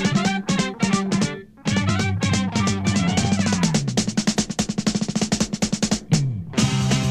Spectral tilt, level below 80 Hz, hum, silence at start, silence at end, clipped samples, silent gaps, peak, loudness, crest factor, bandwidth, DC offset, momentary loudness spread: -4.5 dB/octave; -44 dBFS; none; 0 s; 0 s; under 0.1%; none; -4 dBFS; -22 LUFS; 18 dB; 13.5 kHz; 0.1%; 3 LU